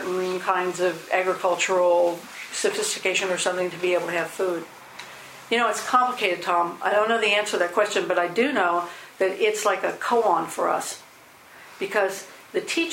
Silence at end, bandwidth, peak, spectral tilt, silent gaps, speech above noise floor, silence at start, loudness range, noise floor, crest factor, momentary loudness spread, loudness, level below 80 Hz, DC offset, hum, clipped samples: 0 s; 16.5 kHz; -4 dBFS; -2.5 dB/octave; none; 26 dB; 0 s; 3 LU; -49 dBFS; 20 dB; 12 LU; -23 LUFS; -74 dBFS; under 0.1%; none; under 0.1%